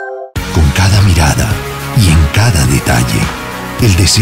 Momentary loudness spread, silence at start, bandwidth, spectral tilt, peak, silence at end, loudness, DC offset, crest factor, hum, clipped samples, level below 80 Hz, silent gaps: 10 LU; 0 s; 16.5 kHz; -4.5 dB/octave; 0 dBFS; 0 s; -11 LUFS; under 0.1%; 10 dB; none; under 0.1%; -18 dBFS; none